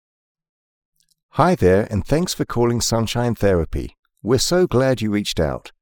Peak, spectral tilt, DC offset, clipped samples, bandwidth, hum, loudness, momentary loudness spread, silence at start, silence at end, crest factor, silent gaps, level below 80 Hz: -2 dBFS; -5 dB/octave; under 0.1%; under 0.1%; 18 kHz; none; -19 LUFS; 10 LU; 1.35 s; 0.15 s; 16 dB; 3.99-4.03 s; -36 dBFS